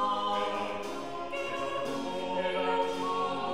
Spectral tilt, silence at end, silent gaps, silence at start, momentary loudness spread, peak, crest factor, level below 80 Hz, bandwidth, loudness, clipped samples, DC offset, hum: -4 dB/octave; 0 s; none; 0 s; 7 LU; -18 dBFS; 14 dB; -62 dBFS; 15.5 kHz; -32 LUFS; under 0.1%; 0.5%; none